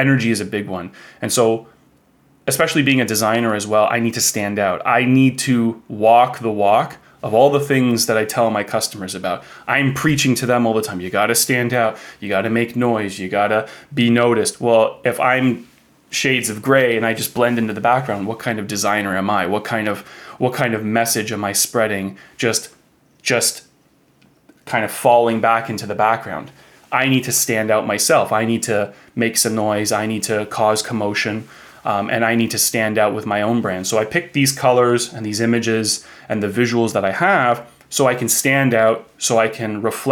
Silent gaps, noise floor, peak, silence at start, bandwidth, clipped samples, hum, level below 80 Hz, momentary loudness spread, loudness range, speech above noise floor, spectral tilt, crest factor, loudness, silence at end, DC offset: none; -56 dBFS; -2 dBFS; 0 s; 19.5 kHz; under 0.1%; none; -60 dBFS; 9 LU; 3 LU; 39 dB; -4 dB/octave; 16 dB; -17 LUFS; 0 s; under 0.1%